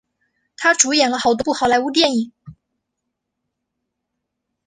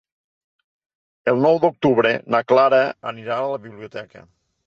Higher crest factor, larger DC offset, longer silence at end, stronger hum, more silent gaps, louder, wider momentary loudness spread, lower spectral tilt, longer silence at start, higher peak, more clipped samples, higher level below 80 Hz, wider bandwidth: about the same, 20 dB vs 16 dB; neither; first, 2.15 s vs 0.45 s; neither; neither; about the same, -16 LUFS vs -18 LUFS; second, 6 LU vs 19 LU; second, -1.5 dB/octave vs -7 dB/octave; second, 0.6 s vs 1.25 s; first, 0 dBFS vs -4 dBFS; neither; first, -58 dBFS vs -64 dBFS; first, 11 kHz vs 7 kHz